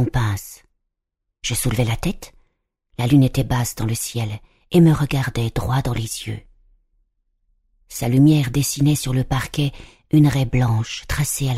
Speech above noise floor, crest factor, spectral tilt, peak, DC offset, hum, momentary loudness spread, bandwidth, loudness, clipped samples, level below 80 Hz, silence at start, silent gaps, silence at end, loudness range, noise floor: 60 dB; 16 dB; -5.5 dB/octave; -4 dBFS; under 0.1%; none; 14 LU; 15.5 kHz; -20 LUFS; under 0.1%; -36 dBFS; 0 s; none; 0 s; 4 LU; -79 dBFS